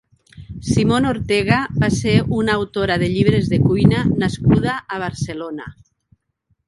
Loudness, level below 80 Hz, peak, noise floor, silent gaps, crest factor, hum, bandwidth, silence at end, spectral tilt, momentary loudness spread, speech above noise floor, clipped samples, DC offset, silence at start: -18 LUFS; -38 dBFS; 0 dBFS; -67 dBFS; none; 18 dB; none; 11.5 kHz; 0.95 s; -6.5 dB/octave; 12 LU; 50 dB; under 0.1%; under 0.1%; 0.35 s